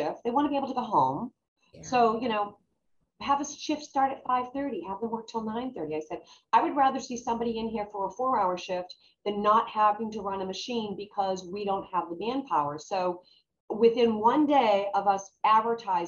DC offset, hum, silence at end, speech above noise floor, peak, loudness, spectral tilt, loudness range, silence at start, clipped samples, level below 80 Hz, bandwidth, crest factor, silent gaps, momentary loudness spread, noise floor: under 0.1%; none; 0 s; 47 dB; -8 dBFS; -28 LUFS; -5 dB/octave; 5 LU; 0 s; under 0.1%; -66 dBFS; 7.4 kHz; 20 dB; 1.48-1.56 s, 13.60-13.68 s; 11 LU; -75 dBFS